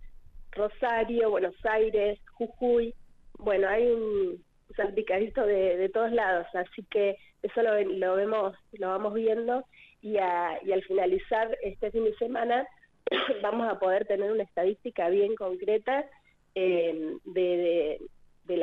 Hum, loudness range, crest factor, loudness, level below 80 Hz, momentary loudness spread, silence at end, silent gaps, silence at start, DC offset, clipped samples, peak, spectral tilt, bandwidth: none; 2 LU; 12 dB; -29 LUFS; -54 dBFS; 8 LU; 0 s; none; 0 s; under 0.1%; under 0.1%; -16 dBFS; -7 dB/octave; 4.3 kHz